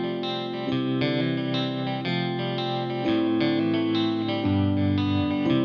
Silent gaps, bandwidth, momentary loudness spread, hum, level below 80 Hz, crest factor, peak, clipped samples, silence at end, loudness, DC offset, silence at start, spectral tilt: none; 6.4 kHz; 5 LU; none; -60 dBFS; 14 dB; -10 dBFS; under 0.1%; 0 s; -25 LUFS; under 0.1%; 0 s; -8 dB/octave